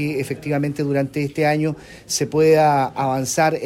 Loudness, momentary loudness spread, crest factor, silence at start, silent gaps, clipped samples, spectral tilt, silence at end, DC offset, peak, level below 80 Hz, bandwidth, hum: -19 LUFS; 10 LU; 14 dB; 0 s; none; under 0.1%; -5 dB/octave; 0 s; under 0.1%; -4 dBFS; -54 dBFS; 16 kHz; none